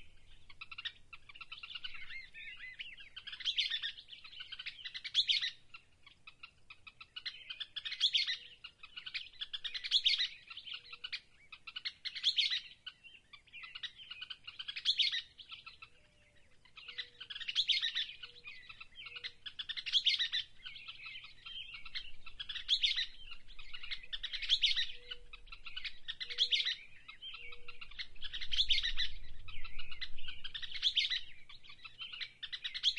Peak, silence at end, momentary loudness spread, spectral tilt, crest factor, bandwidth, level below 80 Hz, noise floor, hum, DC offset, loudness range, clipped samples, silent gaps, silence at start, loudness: -16 dBFS; 0 s; 22 LU; 1 dB/octave; 22 dB; 10.5 kHz; -56 dBFS; -65 dBFS; none; under 0.1%; 4 LU; under 0.1%; none; 0 s; -36 LUFS